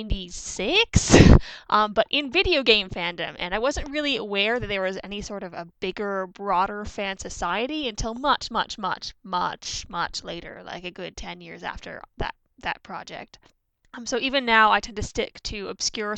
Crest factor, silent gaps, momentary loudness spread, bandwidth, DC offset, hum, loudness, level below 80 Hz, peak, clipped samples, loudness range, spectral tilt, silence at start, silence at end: 24 dB; none; 18 LU; 9.2 kHz; under 0.1%; none; -23 LUFS; -34 dBFS; -2 dBFS; under 0.1%; 14 LU; -4 dB/octave; 0 s; 0 s